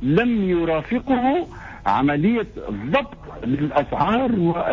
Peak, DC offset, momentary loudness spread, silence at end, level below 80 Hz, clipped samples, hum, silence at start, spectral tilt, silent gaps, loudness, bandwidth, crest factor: -8 dBFS; under 0.1%; 10 LU; 0 s; -42 dBFS; under 0.1%; none; 0 s; -8.5 dB/octave; none; -21 LUFS; 7.2 kHz; 14 dB